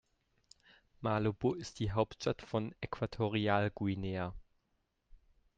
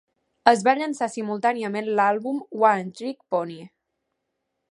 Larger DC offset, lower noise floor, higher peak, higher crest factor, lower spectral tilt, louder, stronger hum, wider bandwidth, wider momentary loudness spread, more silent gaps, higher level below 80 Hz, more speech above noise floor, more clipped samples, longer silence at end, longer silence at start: neither; about the same, -80 dBFS vs -79 dBFS; second, -16 dBFS vs 0 dBFS; about the same, 22 dB vs 24 dB; first, -6.5 dB/octave vs -5 dB/octave; second, -36 LUFS vs -23 LUFS; neither; second, 8.8 kHz vs 11.5 kHz; second, 8 LU vs 12 LU; neither; first, -58 dBFS vs -72 dBFS; second, 45 dB vs 56 dB; neither; second, 0.4 s vs 1.05 s; first, 1 s vs 0.45 s